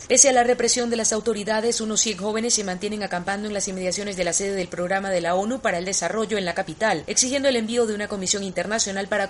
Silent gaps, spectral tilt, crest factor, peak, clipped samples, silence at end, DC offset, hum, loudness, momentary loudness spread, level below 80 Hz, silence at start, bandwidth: none; -2 dB/octave; 22 dB; -2 dBFS; under 0.1%; 0 s; under 0.1%; none; -22 LUFS; 7 LU; -52 dBFS; 0 s; 11.5 kHz